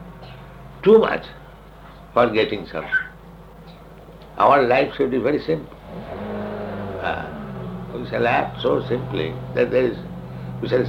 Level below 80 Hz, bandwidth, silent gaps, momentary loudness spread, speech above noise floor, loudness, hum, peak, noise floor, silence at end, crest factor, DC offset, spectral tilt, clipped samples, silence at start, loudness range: -46 dBFS; 15.5 kHz; none; 21 LU; 23 dB; -21 LUFS; none; -2 dBFS; -42 dBFS; 0 s; 20 dB; under 0.1%; -7.5 dB/octave; under 0.1%; 0 s; 5 LU